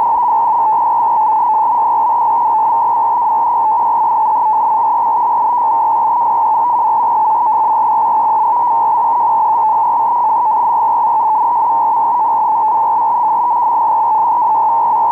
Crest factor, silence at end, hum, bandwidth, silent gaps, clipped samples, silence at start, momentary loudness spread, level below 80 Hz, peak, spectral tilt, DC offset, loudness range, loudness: 6 dB; 0 s; none; 3.1 kHz; none; under 0.1%; 0 s; 1 LU; -60 dBFS; -6 dBFS; -6 dB/octave; under 0.1%; 0 LU; -12 LUFS